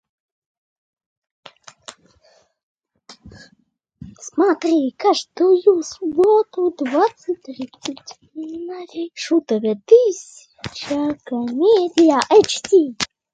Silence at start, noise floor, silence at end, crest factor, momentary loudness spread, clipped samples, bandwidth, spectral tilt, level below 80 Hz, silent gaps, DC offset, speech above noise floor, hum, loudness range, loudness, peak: 1.9 s; -62 dBFS; 0.3 s; 18 dB; 18 LU; under 0.1%; 9.2 kHz; -4 dB/octave; -60 dBFS; 2.63-2.75 s; under 0.1%; 44 dB; none; 6 LU; -17 LUFS; 0 dBFS